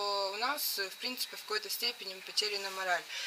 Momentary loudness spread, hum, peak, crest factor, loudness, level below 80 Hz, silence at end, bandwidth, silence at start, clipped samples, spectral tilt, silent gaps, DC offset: 4 LU; none; -16 dBFS; 20 dB; -34 LUFS; under -90 dBFS; 0 s; 16 kHz; 0 s; under 0.1%; 0.5 dB/octave; none; under 0.1%